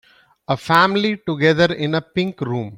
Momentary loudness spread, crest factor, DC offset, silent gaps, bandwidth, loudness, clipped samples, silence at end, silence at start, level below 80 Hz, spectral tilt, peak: 10 LU; 18 dB; under 0.1%; none; 16 kHz; -18 LUFS; under 0.1%; 0 s; 0.5 s; -54 dBFS; -6 dB/octave; -2 dBFS